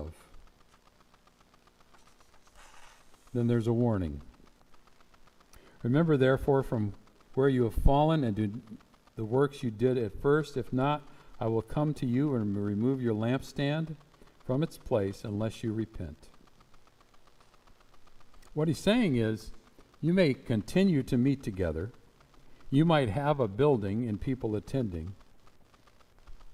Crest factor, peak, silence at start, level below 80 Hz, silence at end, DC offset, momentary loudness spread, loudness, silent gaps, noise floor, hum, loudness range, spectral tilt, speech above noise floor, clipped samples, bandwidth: 22 dB; -8 dBFS; 0 s; -46 dBFS; 0 s; under 0.1%; 13 LU; -30 LUFS; none; -62 dBFS; none; 7 LU; -7.5 dB/octave; 34 dB; under 0.1%; 15 kHz